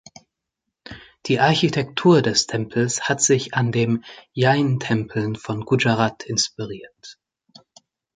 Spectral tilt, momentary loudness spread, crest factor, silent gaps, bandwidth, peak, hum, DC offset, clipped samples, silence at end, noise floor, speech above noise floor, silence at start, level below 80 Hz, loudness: -4.5 dB/octave; 17 LU; 20 dB; none; 9.6 kHz; -2 dBFS; none; under 0.1%; under 0.1%; 1.05 s; -81 dBFS; 61 dB; 0.9 s; -56 dBFS; -20 LUFS